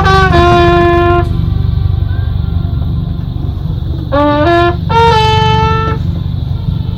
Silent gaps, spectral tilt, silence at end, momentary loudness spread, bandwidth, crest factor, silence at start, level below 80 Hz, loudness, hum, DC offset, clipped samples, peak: none; -7 dB/octave; 0 s; 10 LU; 9.4 kHz; 10 dB; 0 s; -20 dBFS; -11 LUFS; none; 0.5%; 1%; 0 dBFS